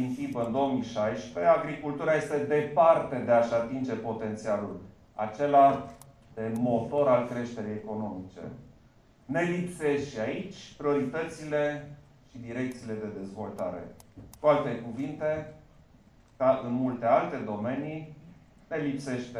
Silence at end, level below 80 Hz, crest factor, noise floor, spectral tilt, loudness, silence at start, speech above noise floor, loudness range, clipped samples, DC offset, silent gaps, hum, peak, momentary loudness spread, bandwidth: 0 s; -62 dBFS; 20 dB; -59 dBFS; -7 dB/octave; -29 LUFS; 0 s; 30 dB; 7 LU; under 0.1%; under 0.1%; none; none; -10 dBFS; 15 LU; 12 kHz